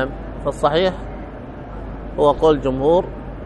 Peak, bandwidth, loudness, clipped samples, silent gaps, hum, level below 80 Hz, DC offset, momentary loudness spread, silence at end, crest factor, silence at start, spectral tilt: -2 dBFS; 10 kHz; -18 LUFS; under 0.1%; none; none; -34 dBFS; under 0.1%; 17 LU; 0 s; 18 dB; 0 s; -6.5 dB/octave